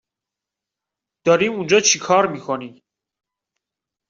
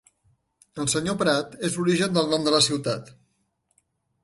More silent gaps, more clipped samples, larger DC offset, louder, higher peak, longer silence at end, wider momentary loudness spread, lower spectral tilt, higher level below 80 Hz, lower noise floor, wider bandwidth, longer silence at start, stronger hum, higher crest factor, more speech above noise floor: neither; neither; neither; first, -18 LUFS vs -23 LUFS; first, -2 dBFS vs -6 dBFS; first, 1.4 s vs 1.15 s; about the same, 12 LU vs 10 LU; second, -2.5 dB/octave vs -4 dB/octave; about the same, -64 dBFS vs -60 dBFS; first, -86 dBFS vs -72 dBFS; second, 7.8 kHz vs 11.5 kHz; first, 1.25 s vs 0.75 s; neither; about the same, 20 dB vs 20 dB; first, 68 dB vs 48 dB